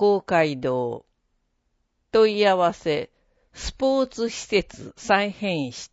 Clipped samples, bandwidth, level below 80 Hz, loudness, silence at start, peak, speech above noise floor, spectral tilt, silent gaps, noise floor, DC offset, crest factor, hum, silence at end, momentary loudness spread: under 0.1%; 8 kHz; -48 dBFS; -23 LUFS; 0 s; -6 dBFS; 49 dB; -4.5 dB/octave; none; -72 dBFS; under 0.1%; 18 dB; none; 0.05 s; 15 LU